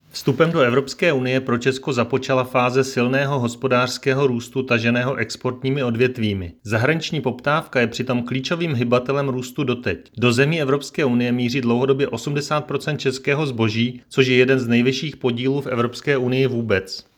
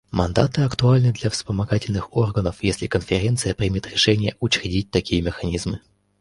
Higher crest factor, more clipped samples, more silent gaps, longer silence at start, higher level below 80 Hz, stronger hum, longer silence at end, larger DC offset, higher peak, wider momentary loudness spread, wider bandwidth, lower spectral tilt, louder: about the same, 18 dB vs 20 dB; neither; neither; about the same, 0.15 s vs 0.15 s; second, -56 dBFS vs -38 dBFS; neither; second, 0.15 s vs 0.45 s; neither; about the same, 0 dBFS vs -2 dBFS; about the same, 6 LU vs 7 LU; first, 18 kHz vs 11.5 kHz; about the same, -6 dB/octave vs -5.5 dB/octave; about the same, -20 LUFS vs -21 LUFS